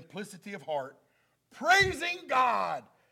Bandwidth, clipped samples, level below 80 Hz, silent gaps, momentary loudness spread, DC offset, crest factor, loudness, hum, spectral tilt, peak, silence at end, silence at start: 16.5 kHz; under 0.1%; -58 dBFS; none; 19 LU; under 0.1%; 20 dB; -28 LUFS; none; -3 dB/octave; -10 dBFS; 0.3 s; 0 s